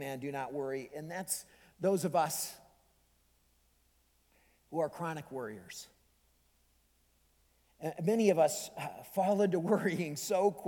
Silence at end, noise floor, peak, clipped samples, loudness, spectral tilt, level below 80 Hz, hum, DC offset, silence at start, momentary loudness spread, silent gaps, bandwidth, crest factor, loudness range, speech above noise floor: 0 s; -71 dBFS; -14 dBFS; under 0.1%; -34 LUFS; -5 dB/octave; -74 dBFS; none; under 0.1%; 0 s; 13 LU; none; 19 kHz; 22 dB; 11 LU; 38 dB